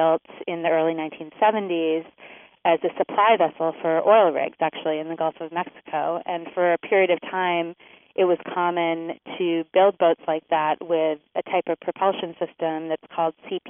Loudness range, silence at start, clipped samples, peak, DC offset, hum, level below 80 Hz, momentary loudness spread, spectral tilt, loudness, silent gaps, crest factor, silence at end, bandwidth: 3 LU; 0 s; under 0.1%; -4 dBFS; under 0.1%; none; -78 dBFS; 11 LU; -0.5 dB/octave; -23 LUFS; none; 18 dB; 0 s; 3.7 kHz